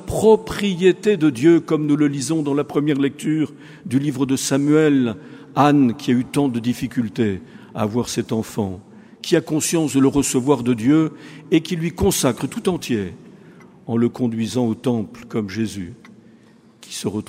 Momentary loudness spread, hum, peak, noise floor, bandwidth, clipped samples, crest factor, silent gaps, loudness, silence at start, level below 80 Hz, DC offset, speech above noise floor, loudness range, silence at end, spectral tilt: 11 LU; none; 0 dBFS; -50 dBFS; 16 kHz; under 0.1%; 18 dB; none; -19 LUFS; 0 s; -48 dBFS; under 0.1%; 31 dB; 5 LU; 0.05 s; -5.5 dB/octave